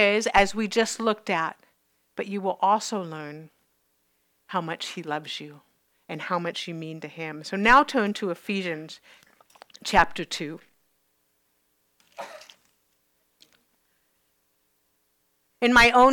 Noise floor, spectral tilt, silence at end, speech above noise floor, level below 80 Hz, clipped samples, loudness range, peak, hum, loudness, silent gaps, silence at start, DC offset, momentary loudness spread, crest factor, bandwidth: -71 dBFS; -3.5 dB/octave; 0 s; 47 dB; -50 dBFS; under 0.1%; 10 LU; -6 dBFS; none; -24 LUFS; none; 0 s; under 0.1%; 23 LU; 22 dB; 18.5 kHz